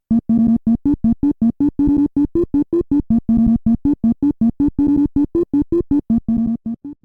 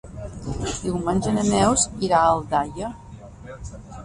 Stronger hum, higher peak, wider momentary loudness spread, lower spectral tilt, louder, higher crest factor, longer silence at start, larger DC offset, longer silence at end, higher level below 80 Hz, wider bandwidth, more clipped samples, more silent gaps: neither; about the same, -4 dBFS vs -6 dBFS; second, 3 LU vs 21 LU; first, -11.5 dB/octave vs -4.5 dB/octave; first, -17 LUFS vs -22 LUFS; second, 12 dB vs 18 dB; about the same, 0.1 s vs 0.05 s; neither; about the same, 0.1 s vs 0 s; first, -32 dBFS vs -40 dBFS; second, 2.6 kHz vs 11.5 kHz; neither; neither